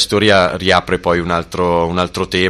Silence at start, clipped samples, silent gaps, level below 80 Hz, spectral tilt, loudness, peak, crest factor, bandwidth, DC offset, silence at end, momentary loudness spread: 0 s; under 0.1%; none; -38 dBFS; -4.5 dB/octave; -14 LUFS; 0 dBFS; 14 dB; 13.5 kHz; under 0.1%; 0 s; 6 LU